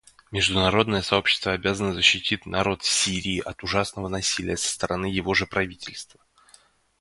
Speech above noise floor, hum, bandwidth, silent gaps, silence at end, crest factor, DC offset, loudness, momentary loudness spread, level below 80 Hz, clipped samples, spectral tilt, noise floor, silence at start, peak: 33 dB; none; 11.5 kHz; none; 0.95 s; 22 dB; under 0.1%; -23 LUFS; 9 LU; -46 dBFS; under 0.1%; -3 dB/octave; -58 dBFS; 0.3 s; -2 dBFS